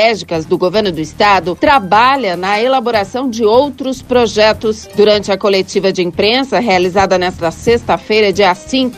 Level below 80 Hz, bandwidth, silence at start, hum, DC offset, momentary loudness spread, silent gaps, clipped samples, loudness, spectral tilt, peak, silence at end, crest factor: -40 dBFS; 15 kHz; 0 s; none; under 0.1%; 7 LU; none; under 0.1%; -12 LUFS; -4.5 dB/octave; 0 dBFS; 0 s; 12 dB